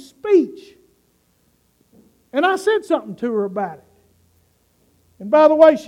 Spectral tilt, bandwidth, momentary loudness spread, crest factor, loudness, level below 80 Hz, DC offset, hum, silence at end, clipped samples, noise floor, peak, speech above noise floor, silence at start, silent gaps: -5.5 dB/octave; 12 kHz; 15 LU; 20 dB; -17 LUFS; -66 dBFS; under 0.1%; 60 Hz at -55 dBFS; 0 s; under 0.1%; -62 dBFS; 0 dBFS; 46 dB; 0.25 s; none